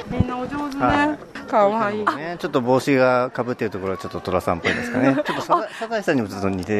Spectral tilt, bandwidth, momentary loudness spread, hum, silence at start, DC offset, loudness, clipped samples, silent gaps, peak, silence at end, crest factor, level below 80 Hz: -6 dB/octave; 13 kHz; 8 LU; none; 0 s; under 0.1%; -21 LUFS; under 0.1%; none; -4 dBFS; 0 s; 16 dB; -46 dBFS